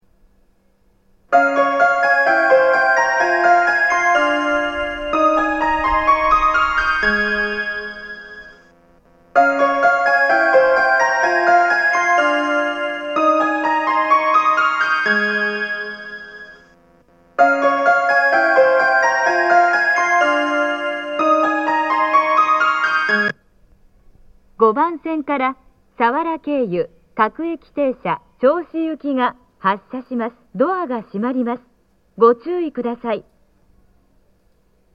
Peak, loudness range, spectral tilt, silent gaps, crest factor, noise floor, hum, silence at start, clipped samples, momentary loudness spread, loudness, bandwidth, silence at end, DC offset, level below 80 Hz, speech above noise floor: 0 dBFS; 7 LU; -4 dB/octave; none; 16 dB; -59 dBFS; none; 1.3 s; under 0.1%; 11 LU; -16 LUFS; 8.8 kHz; 1.75 s; under 0.1%; -46 dBFS; 39 dB